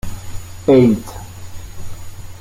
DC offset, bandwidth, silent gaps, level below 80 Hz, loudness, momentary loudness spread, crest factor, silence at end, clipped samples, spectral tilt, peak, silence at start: under 0.1%; 16.5 kHz; none; -36 dBFS; -14 LUFS; 24 LU; 16 dB; 0 s; under 0.1%; -7.5 dB/octave; -2 dBFS; 0.05 s